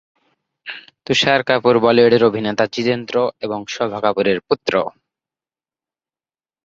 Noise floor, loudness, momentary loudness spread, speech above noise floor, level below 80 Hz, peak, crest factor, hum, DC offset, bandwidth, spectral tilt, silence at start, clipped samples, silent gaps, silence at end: under -90 dBFS; -17 LUFS; 18 LU; over 74 dB; -58 dBFS; -2 dBFS; 18 dB; none; under 0.1%; 7.8 kHz; -5 dB/octave; 0.65 s; under 0.1%; none; 1.75 s